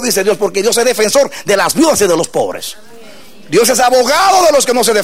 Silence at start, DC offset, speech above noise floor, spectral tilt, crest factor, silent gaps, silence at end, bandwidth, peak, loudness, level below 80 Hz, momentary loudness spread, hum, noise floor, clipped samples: 0 s; 2%; 26 dB; -2.5 dB/octave; 10 dB; none; 0 s; 16.5 kHz; -2 dBFS; -11 LUFS; -48 dBFS; 7 LU; none; -37 dBFS; under 0.1%